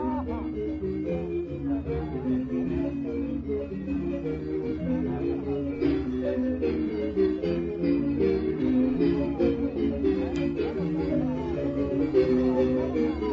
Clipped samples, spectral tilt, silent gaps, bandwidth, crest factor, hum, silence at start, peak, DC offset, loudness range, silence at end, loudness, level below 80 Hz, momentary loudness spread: under 0.1%; -9.5 dB/octave; none; 6.8 kHz; 14 dB; none; 0 s; -12 dBFS; under 0.1%; 4 LU; 0 s; -28 LUFS; -42 dBFS; 7 LU